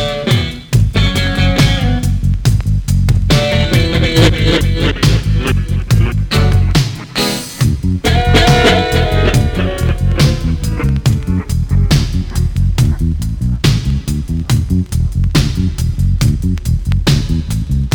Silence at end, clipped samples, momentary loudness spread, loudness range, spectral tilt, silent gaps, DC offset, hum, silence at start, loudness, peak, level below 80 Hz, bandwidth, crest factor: 0 s; under 0.1%; 7 LU; 3 LU; -5.5 dB/octave; none; under 0.1%; none; 0 s; -14 LUFS; -2 dBFS; -18 dBFS; 20 kHz; 10 dB